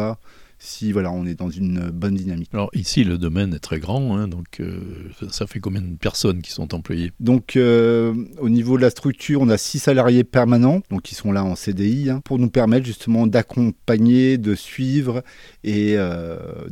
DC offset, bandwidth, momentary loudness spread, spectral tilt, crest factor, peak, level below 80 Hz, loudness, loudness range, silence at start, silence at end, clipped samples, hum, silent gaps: under 0.1%; 15.5 kHz; 13 LU; -6.5 dB/octave; 16 dB; -4 dBFS; -44 dBFS; -20 LUFS; 7 LU; 0 s; 0 s; under 0.1%; none; none